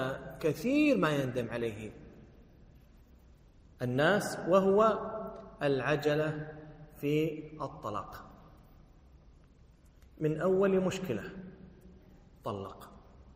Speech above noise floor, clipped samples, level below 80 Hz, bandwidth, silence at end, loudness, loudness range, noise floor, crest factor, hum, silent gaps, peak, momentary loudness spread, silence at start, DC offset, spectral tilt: 29 dB; under 0.1%; -58 dBFS; 15.5 kHz; 0 s; -31 LUFS; 9 LU; -59 dBFS; 20 dB; none; none; -14 dBFS; 19 LU; 0 s; under 0.1%; -6.5 dB/octave